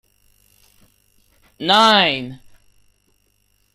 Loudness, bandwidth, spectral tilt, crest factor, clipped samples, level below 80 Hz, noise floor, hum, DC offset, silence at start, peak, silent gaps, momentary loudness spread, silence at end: -14 LUFS; 15.5 kHz; -3.5 dB/octave; 22 dB; under 0.1%; -60 dBFS; -63 dBFS; 50 Hz at -50 dBFS; under 0.1%; 1.6 s; 0 dBFS; none; 16 LU; 1.4 s